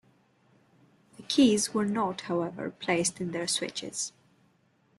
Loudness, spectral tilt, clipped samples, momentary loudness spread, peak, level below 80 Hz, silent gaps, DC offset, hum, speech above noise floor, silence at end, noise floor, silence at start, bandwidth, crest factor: -29 LUFS; -3.5 dB/octave; under 0.1%; 12 LU; -12 dBFS; -68 dBFS; none; under 0.1%; none; 39 dB; 0.9 s; -67 dBFS; 1.2 s; 12.5 kHz; 20 dB